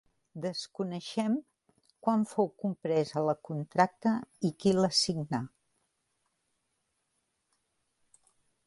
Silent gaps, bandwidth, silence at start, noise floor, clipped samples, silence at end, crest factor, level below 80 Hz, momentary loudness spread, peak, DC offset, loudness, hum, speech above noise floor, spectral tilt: none; 11.5 kHz; 0.35 s; -80 dBFS; under 0.1%; 3.2 s; 22 dB; -72 dBFS; 10 LU; -12 dBFS; under 0.1%; -31 LUFS; none; 49 dB; -5 dB/octave